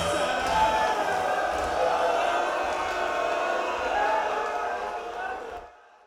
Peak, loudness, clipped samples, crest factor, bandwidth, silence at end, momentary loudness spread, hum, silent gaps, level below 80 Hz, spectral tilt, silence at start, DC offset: -12 dBFS; -26 LUFS; under 0.1%; 14 dB; 16.5 kHz; 0.3 s; 10 LU; none; none; -52 dBFS; -3 dB/octave; 0 s; under 0.1%